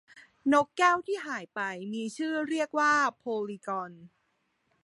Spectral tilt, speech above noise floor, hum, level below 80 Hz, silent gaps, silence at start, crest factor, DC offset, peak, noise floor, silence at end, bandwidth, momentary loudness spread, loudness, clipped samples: -4 dB/octave; 46 dB; none; -78 dBFS; none; 0.15 s; 20 dB; under 0.1%; -10 dBFS; -75 dBFS; 0.8 s; 11.5 kHz; 11 LU; -29 LUFS; under 0.1%